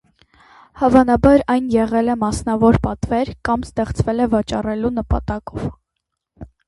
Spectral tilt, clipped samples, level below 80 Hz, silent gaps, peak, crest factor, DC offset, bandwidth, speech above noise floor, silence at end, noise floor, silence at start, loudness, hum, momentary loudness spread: -7 dB/octave; under 0.1%; -32 dBFS; none; 0 dBFS; 18 dB; under 0.1%; 11.5 kHz; 61 dB; 0.2 s; -78 dBFS; 0.75 s; -18 LUFS; none; 10 LU